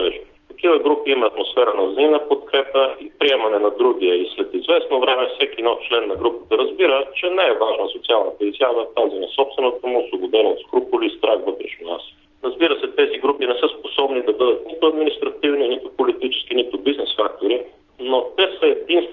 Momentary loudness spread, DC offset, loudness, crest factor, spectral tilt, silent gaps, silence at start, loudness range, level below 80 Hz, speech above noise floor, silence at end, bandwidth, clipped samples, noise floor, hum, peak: 5 LU; under 0.1%; -19 LUFS; 16 dB; -5.5 dB/octave; none; 0 s; 3 LU; -58 dBFS; 19 dB; 0 s; 4.2 kHz; under 0.1%; -38 dBFS; none; -2 dBFS